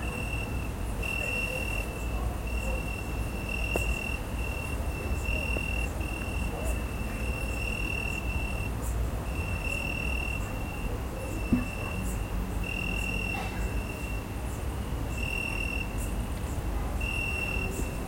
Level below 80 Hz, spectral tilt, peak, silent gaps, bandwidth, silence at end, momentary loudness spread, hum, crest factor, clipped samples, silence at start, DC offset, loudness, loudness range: -34 dBFS; -5 dB/octave; -12 dBFS; none; 16.5 kHz; 0 s; 5 LU; none; 18 dB; under 0.1%; 0 s; under 0.1%; -32 LUFS; 1 LU